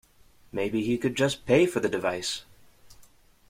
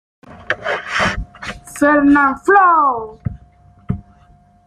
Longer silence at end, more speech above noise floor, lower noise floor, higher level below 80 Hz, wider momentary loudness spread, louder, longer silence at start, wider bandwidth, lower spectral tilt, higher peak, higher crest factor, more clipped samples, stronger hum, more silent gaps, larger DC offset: second, 0.45 s vs 0.65 s; second, 31 dB vs 36 dB; first, -57 dBFS vs -49 dBFS; second, -58 dBFS vs -38 dBFS; second, 10 LU vs 18 LU; second, -27 LUFS vs -14 LUFS; first, 0.55 s vs 0.3 s; first, 16 kHz vs 13 kHz; about the same, -5 dB/octave vs -5.5 dB/octave; second, -6 dBFS vs -2 dBFS; first, 22 dB vs 16 dB; neither; neither; neither; neither